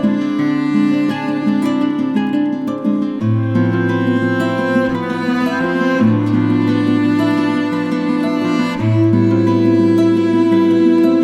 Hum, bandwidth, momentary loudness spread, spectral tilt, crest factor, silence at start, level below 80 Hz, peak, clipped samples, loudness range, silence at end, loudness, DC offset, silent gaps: none; 11.5 kHz; 5 LU; -8 dB/octave; 12 dB; 0 s; -54 dBFS; -2 dBFS; under 0.1%; 3 LU; 0 s; -15 LUFS; under 0.1%; none